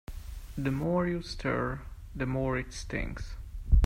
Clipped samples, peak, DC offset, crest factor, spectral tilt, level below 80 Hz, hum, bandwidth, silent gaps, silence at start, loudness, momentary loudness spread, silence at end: under 0.1%; -10 dBFS; under 0.1%; 20 dB; -6.5 dB/octave; -34 dBFS; none; 15.5 kHz; none; 0.1 s; -33 LUFS; 15 LU; 0 s